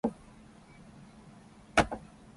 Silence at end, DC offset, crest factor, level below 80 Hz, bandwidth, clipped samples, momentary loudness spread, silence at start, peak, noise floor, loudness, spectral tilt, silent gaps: 0.35 s; under 0.1%; 28 dB; -52 dBFS; 11.5 kHz; under 0.1%; 26 LU; 0.05 s; -8 dBFS; -55 dBFS; -31 LUFS; -4.5 dB/octave; none